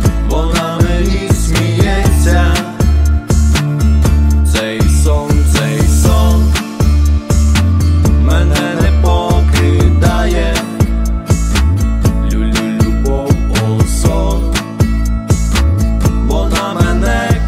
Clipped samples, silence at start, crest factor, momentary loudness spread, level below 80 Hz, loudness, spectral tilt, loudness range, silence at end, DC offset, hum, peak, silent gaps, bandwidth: under 0.1%; 0 s; 10 dB; 4 LU; -12 dBFS; -12 LUFS; -6 dB/octave; 2 LU; 0 s; under 0.1%; none; 0 dBFS; none; 15.5 kHz